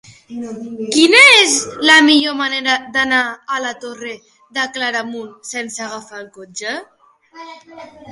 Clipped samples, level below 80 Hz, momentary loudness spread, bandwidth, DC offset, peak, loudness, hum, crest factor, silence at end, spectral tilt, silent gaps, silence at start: under 0.1%; -60 dBFS; 23 LU; 11.5 kHz; under 0.1%; 0 dBFS; -12 LUFS; none; 16 dB; 0 s; -0.5 dB/octave; none; 0.3 s